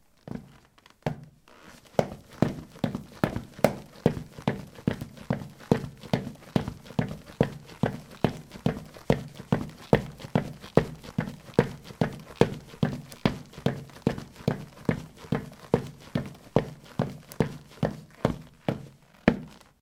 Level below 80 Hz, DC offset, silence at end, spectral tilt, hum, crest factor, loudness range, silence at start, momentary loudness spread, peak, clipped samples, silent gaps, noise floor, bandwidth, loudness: -50 dBFS; under 0.1%; 0.25 s; -7 dB/octave; none; 30 dB; 3 LU; 0.25 s; 9 LU; -2 dBFS; under 0.1%; none; -58 dBFS; 18 kHz; -31 LUFS